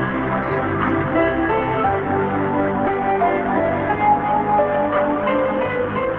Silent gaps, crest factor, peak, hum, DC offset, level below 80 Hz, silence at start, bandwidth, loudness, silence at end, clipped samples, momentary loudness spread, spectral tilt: none; 14 dB; -4 dBFS; none; under 0.1%; -42 dBFS; 0 s; 4.4 kHz; -19 LUFS; 0 s; under 0.1%; 3 LU; -9.5 dB/octave